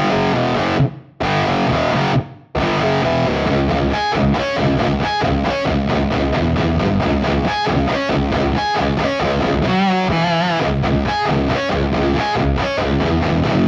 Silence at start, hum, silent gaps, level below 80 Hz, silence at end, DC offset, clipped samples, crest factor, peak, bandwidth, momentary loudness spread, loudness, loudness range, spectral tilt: 0 s; none; none; -28 dBFS; 0 s; under 0.1%; under 0.1%; 12 dB; -4 dBFS; 7.6 kHz; 2 LU; -17 LUFS; 1 LU; -6.5 dB/octave